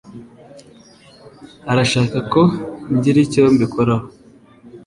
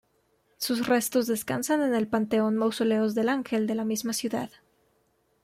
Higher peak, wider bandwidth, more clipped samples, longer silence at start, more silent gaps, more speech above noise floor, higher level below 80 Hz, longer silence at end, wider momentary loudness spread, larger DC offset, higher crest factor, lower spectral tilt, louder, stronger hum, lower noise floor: first, -2 dBFS vs -12 dBFS; second, 11.5 kHz vs 16 kHz; neither; second, 0.05 s vs 0.6 s; neither; second, 31 dB vs 43 dB; first, -48 dBFS vs -68 dBFS; second, 0.05 s vs 0.95 s; first, 8 LU vs 5 LU; neither; about the same, 16 dB vs 14 dB; first, -6.5 dB/octave vs -4 dB/octave; first, -16 LUFS vs -27 LUFS; neither; second, -46 dBFS vs -70 dBFS